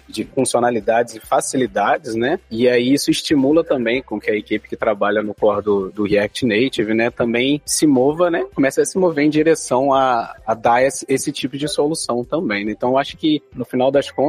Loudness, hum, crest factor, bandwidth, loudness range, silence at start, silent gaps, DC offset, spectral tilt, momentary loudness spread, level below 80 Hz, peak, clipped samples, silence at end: -18 LUFS; none; 14 dB; 15.5 kHz; 3 LU; 0.1 s; none; under 0.1%; -4.5 dB/octave; 6 LU; -50 dBFS; -4 dBFS; under 0.1%; 0 s